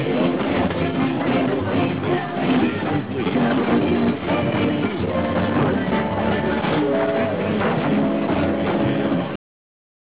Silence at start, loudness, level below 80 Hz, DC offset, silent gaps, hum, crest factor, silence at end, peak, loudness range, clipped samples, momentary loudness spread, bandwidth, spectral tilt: 0 s; -21 LUFS; -42 dBFS; 0.5%; none; none; 10 dB; 0.75 s; -10 dBFS; 1 LU; under 0.1%; 3 LU; 4 kHz; -11 dB/octave